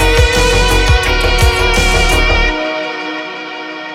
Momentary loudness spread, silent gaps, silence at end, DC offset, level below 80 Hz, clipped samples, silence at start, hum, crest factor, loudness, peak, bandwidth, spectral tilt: 12 LU; none; 0 s; under 0.1%; -16 dBFS; under 0.1%; 0 s; none; 12 dB; -12 LUFS; 0 dBFS; 16 kHz; -4 dB/octave